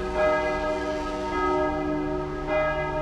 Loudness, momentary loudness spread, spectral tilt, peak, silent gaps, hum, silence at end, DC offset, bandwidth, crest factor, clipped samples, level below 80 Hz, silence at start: -26 LUFS; 6 LU; -6 dB/octave; -12 dBFS; none; none; 0 s; under 0.1%; 10.5 kHz; 14 dB; under 0.1%; -40 dBFS; 0 s